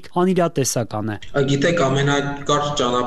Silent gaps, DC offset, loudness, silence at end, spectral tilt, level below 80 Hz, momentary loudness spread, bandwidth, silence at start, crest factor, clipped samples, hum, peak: none; 2%; -20 LUFS; 0 s; -5 dB/octave; -44 dBFS; 6 LU; 13.5 kHz; 0.05 s; 16 dB; under 0.1%; none; -4 dBFS